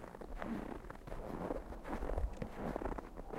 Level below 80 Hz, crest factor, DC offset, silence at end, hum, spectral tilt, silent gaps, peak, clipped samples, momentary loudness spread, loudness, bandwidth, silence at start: -46 dBFS; 20 dB; under 0.1%; 0 s; none; -7.5 dB/octave; none; -22 dBFS; under 0.1%; 7 LU; -45 LUFS; 15.5 kHz; 0 s